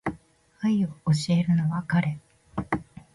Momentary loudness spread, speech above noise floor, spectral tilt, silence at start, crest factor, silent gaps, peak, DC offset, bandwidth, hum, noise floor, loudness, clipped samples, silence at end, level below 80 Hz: 13 LU; 30 dB; -7 dB/octave; 0.05 s; 16 dB; none; -10 dBFS; under 0.1%; 11.5 kHz; none; -53 dBFS; -26 LUFS; under 0.1%; 0.3 s; -54 dBFS